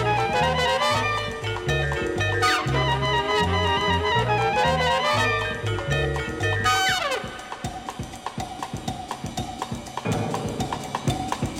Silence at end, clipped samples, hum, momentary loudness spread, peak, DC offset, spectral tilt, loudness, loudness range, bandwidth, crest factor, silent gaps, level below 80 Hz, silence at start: 0 s; under 0.1%; none; 12 LU; -8 dBFS; under 0.1%; -4.5 dB/octave; -24 LUFS; 9 LU; 16.5 kHz; 16 dB; none; -40 dBFS; 0 s